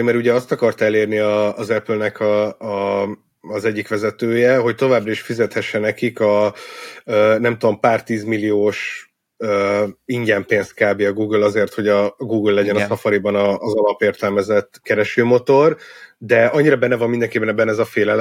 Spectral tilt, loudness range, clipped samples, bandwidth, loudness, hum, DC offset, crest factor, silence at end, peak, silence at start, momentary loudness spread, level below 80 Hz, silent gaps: -6.5 dB/octave; 3 LU; under 0.1%; 15.5 kHz; -17 LUFS; none; under 0.1%; 16 dB; 0 s; -2 dBFS; 0 s; 7 LU; -66 dBFS; none